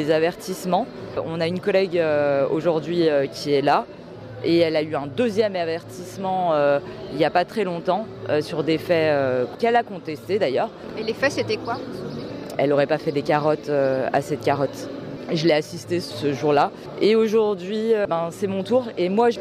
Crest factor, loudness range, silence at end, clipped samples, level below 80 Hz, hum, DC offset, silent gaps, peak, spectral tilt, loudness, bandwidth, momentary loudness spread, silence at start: 14 dB; 2 LU; 0 s; under 0.1%; -60 dBFS; none; under 0.1%; none; -6 dBFS; -6 dB/octave; -22 LUFS; 15 kHz; 10 LU; 0 s